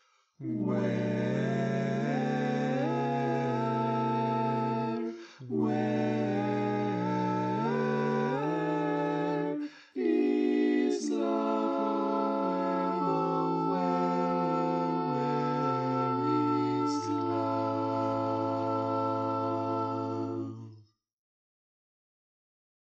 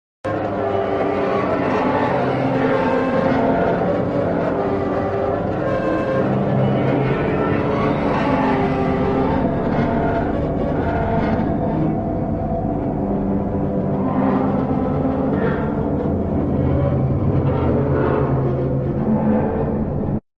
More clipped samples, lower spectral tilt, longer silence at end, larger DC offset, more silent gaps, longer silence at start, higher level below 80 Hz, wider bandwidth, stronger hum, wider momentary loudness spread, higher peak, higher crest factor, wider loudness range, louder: neither; second, -7.5 dB/octave vs -9.5 dB/octave; first, 2 s vs 0.2 s; neither; neither; first, 0.4 s vs 0.25 s; second, -74 dBFS vs -34 dBFS; first, 8.6 kHz vs 7 kHz; neither; about the same, 4 LU vs 3 LU; second, -16 dBFS vs -6 dBFS; about the same, 14 dB vs 14 dB; about the same, 3 LU vs 2 LU; second, -30 LUFS vs -19 LUFS